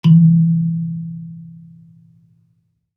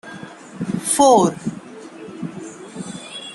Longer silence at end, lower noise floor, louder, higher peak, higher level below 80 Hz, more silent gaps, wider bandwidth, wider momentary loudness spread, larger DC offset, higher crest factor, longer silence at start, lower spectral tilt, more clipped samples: first, 1.45 s vs 0 s; first, -63 dBFS vs -37 dBFS; about the same, -15 LUFS vs -17 LUFS; about the same, -2 dBFS vs -2 dBFS; second, -70 dBFS vs -62 dBFS; neither; second, 3.6 kHz vs 12.5 kHz; about the same, 24 LU vs 23 LU; neither; second, 14 dB vs 20 dB; about the same, 0.05 s vs 0.05 s; first, -10.5 dB/octave vs -4.5 dB/octave; neither